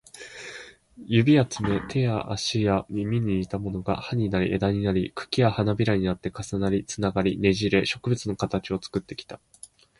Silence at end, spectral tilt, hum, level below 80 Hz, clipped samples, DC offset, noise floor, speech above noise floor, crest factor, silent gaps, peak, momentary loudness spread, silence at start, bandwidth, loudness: 0.65 s; -6 dB/octave; none; -48 dBFS; under 0.1%; under 0.1%; -45 dBFS; 20 dB; 18 dB; none; -6 dBFS; 16 LU; 0.15 s; 11.5 kHz; -25 LUFS